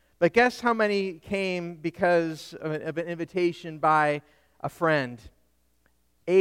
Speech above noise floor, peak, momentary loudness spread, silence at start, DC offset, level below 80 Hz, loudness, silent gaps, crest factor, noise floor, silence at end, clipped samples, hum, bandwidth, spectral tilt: 43 dB; -6 dBFS; 13 LU; 0.2 s; under 0.1%; -62 dBFS; -26 LUFS; none; 20 dB; -69 dBFS; 0 s; under 0.1%; none; 15.5 kHz; -6 dB/octave